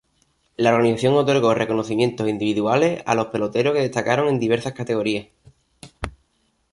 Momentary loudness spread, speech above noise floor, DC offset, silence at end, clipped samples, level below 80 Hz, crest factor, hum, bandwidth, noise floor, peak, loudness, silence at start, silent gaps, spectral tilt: 10 LU; 47 dB; under 0.1%; 0.65 s; under 0.1%; -50 dBFS; 18 dB; none; 11.5 kHz; -67 dBFS; -4 dBFS; -20 LUFS; 0.6 s; none; -6 dB/octave